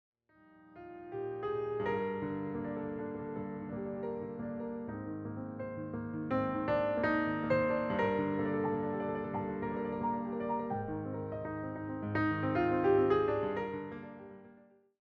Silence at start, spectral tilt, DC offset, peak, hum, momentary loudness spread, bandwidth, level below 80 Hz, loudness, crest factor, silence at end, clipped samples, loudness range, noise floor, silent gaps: 0.55 s; -9.5 dB/octave; under 0.1%; -18 dBFS; none; 11 LU; 5.8 kHz; -62 dBFS; -35 LUFS; 18 dB; 0.4 s; under 0.1%; 7 LU; -63 dBFS; none